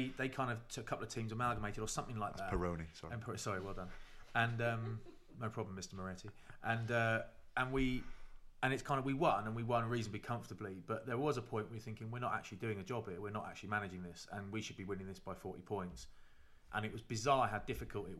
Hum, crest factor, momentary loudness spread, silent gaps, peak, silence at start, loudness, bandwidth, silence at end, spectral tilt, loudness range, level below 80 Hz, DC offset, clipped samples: none; 22 dB; 13 LU; none; -20 dBFS; 0 s; -41 LUFS; 14 kHz; 0 s; -5.5 dB/octave; 6 LU; -56 dBFS; under 0.1%; under 0.1%